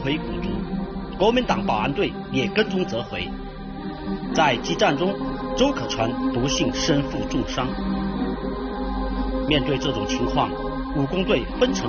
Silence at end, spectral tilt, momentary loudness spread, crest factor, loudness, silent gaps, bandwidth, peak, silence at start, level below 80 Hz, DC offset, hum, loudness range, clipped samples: 0 s; -4 dB/octave; 9 LU; 18 dB; -24 LUFS; none; 7 kHz; -6 dBFS; 0 s; -36 dBFS; under 0.1%; none; 2 LU; under 0.1%